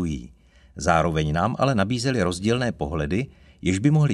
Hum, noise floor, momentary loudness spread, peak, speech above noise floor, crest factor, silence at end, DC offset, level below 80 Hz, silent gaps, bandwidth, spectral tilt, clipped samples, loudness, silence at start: none; -50 dBFS; 8 LU; -4 dBFS; 29 dB; 20 dB; 0 s; under 0.1%; -40 dBFS; none; 11.5 kHz; -6 dB/octave; under 0.1%; -23 LUFS; 0 s